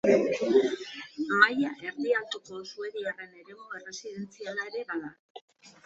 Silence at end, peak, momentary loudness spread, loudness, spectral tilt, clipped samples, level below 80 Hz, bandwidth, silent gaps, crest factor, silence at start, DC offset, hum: 0.15 s; -6 dBFS; 19 LU; -29 LUFS; -4 dB/octave; under 0.1%; -72 dBFS; 8 kHz; 5.19-5.35 s, 5.41-5.48 s; 24 dB; 0.05 s; under 0.1%; none